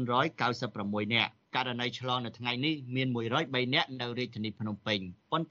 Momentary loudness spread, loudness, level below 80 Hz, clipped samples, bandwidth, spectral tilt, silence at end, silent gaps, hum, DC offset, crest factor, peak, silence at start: 7 LU; -32 LUFS; -74 dBFS; under 0.1%; 7.6 kHz; -3 dB/octave; 0.05 s; none; none; under 0.1%; 20 dB; -12 dBFS; 0 s